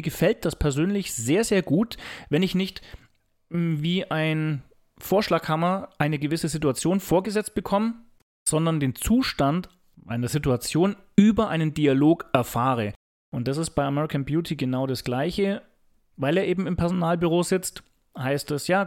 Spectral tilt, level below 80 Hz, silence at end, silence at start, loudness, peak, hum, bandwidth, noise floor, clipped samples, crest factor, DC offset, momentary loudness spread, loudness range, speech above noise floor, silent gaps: -5.5 dB/octave; -46 dBFS; 0 s; 0 s; -24 LUFS; -4 dBFS; none; 17 kHz; -61 dBFS; under 0.1%; 20 dB; under 0.1%; 8 LU; 4 LU; 38 dB; 8.22-8.46 s, 12.96-13.32 s